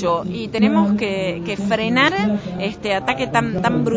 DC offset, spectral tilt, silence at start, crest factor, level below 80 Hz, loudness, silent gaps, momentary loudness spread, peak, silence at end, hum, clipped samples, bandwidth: under 0.1%; -6 dB/octave; 0 s; 16 dB; -46 dBFS; -19 LUFS; none; 8 LU; -2 dBFS; 0 s; none; under 0.1%; 8 kHz